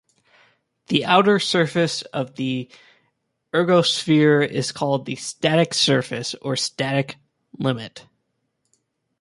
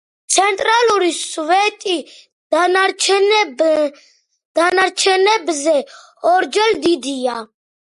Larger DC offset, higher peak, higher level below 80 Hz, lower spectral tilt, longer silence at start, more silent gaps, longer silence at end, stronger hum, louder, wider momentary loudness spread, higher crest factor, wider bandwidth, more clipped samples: neither; about the same, -2 dBFS vs 0 dBFS; about the same, -64 dBFS vs -64 dBFS; first, -4.5 dB/octave vs -0.5 dB/octave; first, 0.9 s vs 0.3 s; second, none vs 2.32-2.50 s, 4.45-4.55 s; first, 1.2 s vs 0.4 s; neither; second, -20 LUFS vs -15 LUFS; first, 12 LU vs 9 LU; about the same, 20 dB vs 16 dB; about the same, 11.5 kHz vs 11.5 kHz; neither